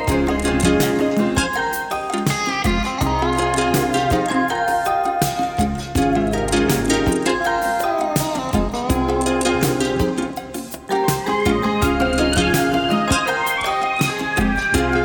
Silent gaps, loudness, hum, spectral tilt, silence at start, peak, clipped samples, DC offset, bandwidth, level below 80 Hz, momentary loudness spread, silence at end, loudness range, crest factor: none; -19 LUFS; none; -4.5 dB/octave; 0 s; -2 dBFS; under 0.1%; under 0.1%; over 20 kHz; -32 dBFS; 4 LU; 0 s; 2 LU; 16 dB